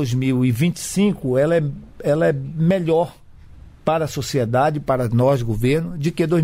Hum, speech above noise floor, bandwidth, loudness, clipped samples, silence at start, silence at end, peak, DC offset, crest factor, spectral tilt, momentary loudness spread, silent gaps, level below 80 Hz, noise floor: none; 23 dB; 16 kHz; -20 LUFS; under 0.1%; 0 s; 0 s; -6 dBFS; under 0.1%; 14 dB; -6.5 dB/octave; 5 LU; none; -42 dBFS; -42 dBFS